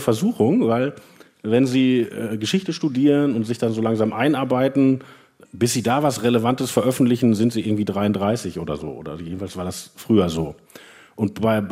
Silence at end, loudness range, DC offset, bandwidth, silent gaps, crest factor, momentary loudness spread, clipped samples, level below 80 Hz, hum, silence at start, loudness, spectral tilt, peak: 0 s; 4 LU; under 0.1%; 16 kHz; none; 16 dB; 12 LU; under 0.1%; -56 dBFS; none; 0 s; -21 LUFS; -6 dB/octave; -4 dBFS